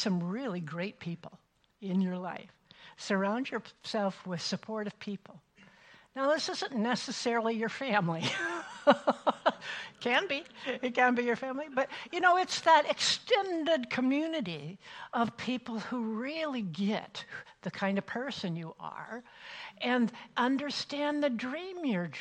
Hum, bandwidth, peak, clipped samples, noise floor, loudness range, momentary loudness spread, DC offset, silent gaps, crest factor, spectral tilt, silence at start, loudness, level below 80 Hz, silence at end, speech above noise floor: none; 10.5 kHz; -10 dBFS; under 0.1%; -59 dBFS; 8 LU; 15 LU; under 0.1%; none; 22 dB; -4.5 dB/octave; 0 s; -32 LUFS; -76 dBFS; 0 s; 27 dB